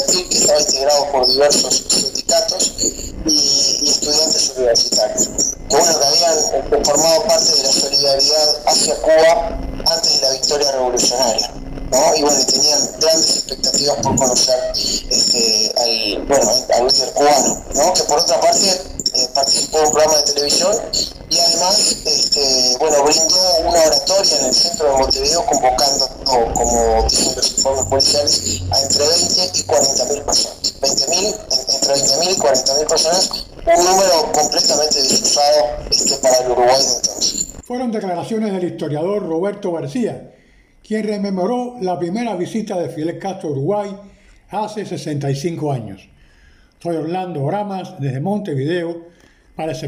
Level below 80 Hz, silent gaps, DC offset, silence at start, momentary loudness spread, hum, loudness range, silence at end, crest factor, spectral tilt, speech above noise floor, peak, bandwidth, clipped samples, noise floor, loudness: -38 dBFS; none; under 0.1%; 0 s; 11 LU; none; 10 LU; 0 s; 12 dB; -2 dB/octave; 34 dB; -4 dBFS; 16 kHz; under 0.1%; -49 dBFS; -14 LUFS